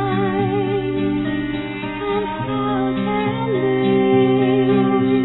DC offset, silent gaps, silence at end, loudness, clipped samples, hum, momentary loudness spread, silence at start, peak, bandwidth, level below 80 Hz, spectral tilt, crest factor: under 0.1%; none; 0 s; -19 LUFS; under 0.1%; none; 8 LU; 0 s; -6 dBFS; 4.1 kHz; -44 dBFS; -11 dB/octave; 14 dB